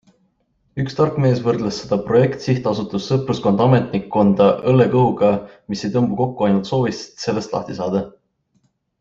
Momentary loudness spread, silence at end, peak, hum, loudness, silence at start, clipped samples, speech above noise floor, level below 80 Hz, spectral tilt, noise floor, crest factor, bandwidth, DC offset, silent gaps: 10 LU; 0.9 s; -2 dBFS; none; -18 LUFS; 0.75 s; under 0.1%; 47 dB; -52 dBFS; -7.5 dB/octave; -65 dBFS; 16 dB; 7.6 kHz; under 0.1%; none